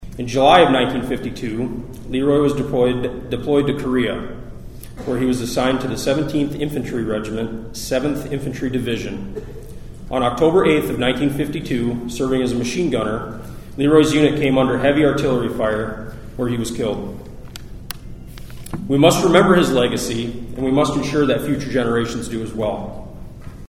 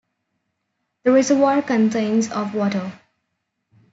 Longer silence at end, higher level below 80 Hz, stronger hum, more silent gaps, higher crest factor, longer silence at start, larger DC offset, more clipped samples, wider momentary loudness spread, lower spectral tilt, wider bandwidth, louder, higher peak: second, 0.05 s vs 1 s; first, -38 dBFS vs -70 dBFS; neither; neither; about the same, 18 dB vs 16 dB; second, 0 s vs 1.05 s; neither; neither; first, 19 LU vs 8 LU; about the same, -5.5 dB/octave vs -5.5 dB/octave; first, 16.5 kHz vs 8 kHz; about the same, -19 LUFS vs -19 LUFS; first, 0 dBFS vs -6 dBFS